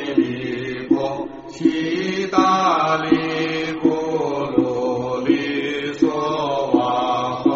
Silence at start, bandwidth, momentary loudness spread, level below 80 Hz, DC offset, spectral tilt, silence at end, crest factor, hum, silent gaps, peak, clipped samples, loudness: 0 s; 7.6 kHz; 6 LU; -54 dBFS; under 0.1%; -4 dB/octave; 0 s; 18 dB; none; none; -2 dBFS; under 0.1%; -20 LUFS